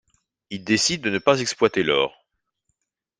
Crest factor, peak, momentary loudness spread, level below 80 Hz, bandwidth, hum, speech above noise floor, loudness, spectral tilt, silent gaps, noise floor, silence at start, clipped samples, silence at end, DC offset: 22 dB; -2 dBFS; 9 LU; -60 dBFS; 10 kHz; none; 55 dB; -21 LUFS; -3 dB/octave; none; -76 dBFS; 0.5 s; under 0.1%; 1.1 s; under 0.1%